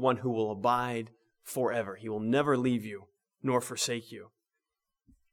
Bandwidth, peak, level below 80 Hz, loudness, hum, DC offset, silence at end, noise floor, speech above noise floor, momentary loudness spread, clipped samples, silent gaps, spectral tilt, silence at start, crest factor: 18.5 kHz; -12 dBFS; -72 dBFS; -31 LUFS; none; under 0.1%; 1.05 s; -87 dBFS; 57 dB; 19 LU; under 0.1%; none; -5 dB/octave; 0 s; 20 dB